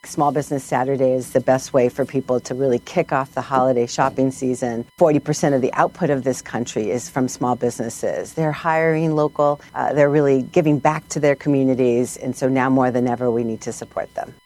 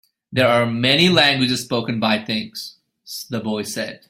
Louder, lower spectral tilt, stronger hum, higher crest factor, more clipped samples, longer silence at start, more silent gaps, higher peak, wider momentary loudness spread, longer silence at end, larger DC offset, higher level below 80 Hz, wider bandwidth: about the same, -20 LUFS vs -18 LUFS; first, -6 dB/octave vs -4.5 dB/octave; neither; about the same, 18 dB vs 20 dB; neither; second, 0.05 s vs 0.3 s; neither; about the same, 0 dBFS vs 0 dBFS; second, 7 LU vs 18 LU; about the same, 0.15 s vs 0.15 s; neither; about the same, -56 dBFS vs -56 dBFS; second, 14.5 kHz vs 16 kHz